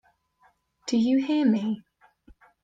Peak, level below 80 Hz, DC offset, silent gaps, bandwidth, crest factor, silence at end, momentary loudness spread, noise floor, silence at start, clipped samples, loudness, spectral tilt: -12 dBFS; -66 dBFS; under 0.1%; none; 8.6 kHz; 16 dB; 0.85 s; 12 LU; -65 dBFS; 0.85 s; under 0.1%; -25 LUFS; -6 dB/octave